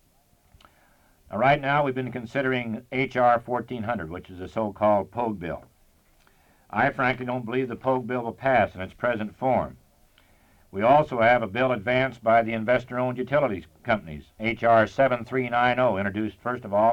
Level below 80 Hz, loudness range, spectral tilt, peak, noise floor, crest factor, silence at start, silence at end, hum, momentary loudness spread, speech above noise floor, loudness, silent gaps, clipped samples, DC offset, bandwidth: -54 dBFS; 5 LU; -7.5 dB/octave; -8 dBFS; -62 dBFS; 18 dB; 1.3 s; 0 s; none; 11 LU; 38 dB; -25 LUFS; none; under 0.1%; under 0.1%; 10 kHz